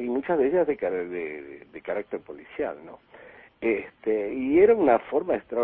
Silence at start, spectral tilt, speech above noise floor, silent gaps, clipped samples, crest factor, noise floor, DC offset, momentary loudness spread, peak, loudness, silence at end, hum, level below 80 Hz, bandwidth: 0 s; -10.5 dB/octave; 24 dB; none; under 0.1%; 18 dB; -50 dBFS; under 0.1%; 18 LU; -8 dBFS; -25 LUFS; 0 s; none; -60 dBFS; 3.9 kHz